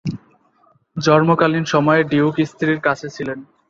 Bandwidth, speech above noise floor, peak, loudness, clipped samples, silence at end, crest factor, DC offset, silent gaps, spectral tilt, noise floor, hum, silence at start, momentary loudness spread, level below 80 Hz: 7.6 kHz; 41 dB; 0 dBFS; -17 LUFS; under 0.1%; 0.25 s; 18 dB; under 0.1%; none; -6.5 dB/octave; -57 dBFS; none; 0.05 s; 14 LU; -56 dBFS